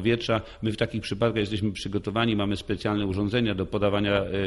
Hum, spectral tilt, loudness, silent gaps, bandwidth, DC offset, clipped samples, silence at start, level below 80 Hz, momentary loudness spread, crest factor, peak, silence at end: none; -6.5 dB/octave; -27 LUFS; none; 11.5 kHz; under 0.1%; under 0.1%; 0 s; -48 dBFS; 4 LU; 16 dB; -10 dBFS; 0 s